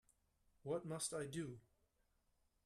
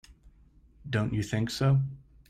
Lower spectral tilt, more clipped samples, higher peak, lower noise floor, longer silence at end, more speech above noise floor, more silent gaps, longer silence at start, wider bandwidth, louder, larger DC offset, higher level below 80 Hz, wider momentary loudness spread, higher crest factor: second, -4.5 dB/octave vs -6.5 dB/octave; neither; second, -32 dBFS vs -14 dBFS; first, -82 dBFS vs -59 dBFS; first, 1.05 s vs 0.3 s; first, 36 dB vs 32 dB; neither; first, 0.65 s vs 0.1 s; about the same, 13.5 kHz vs 13.5 kHz; second, -46 LUFS vs -29 LUFS; neither; second, -78 dBFS vs -52 dBFS; about the same, 12 LU vs 10 LU; about the same, 18 dB vs 16 dB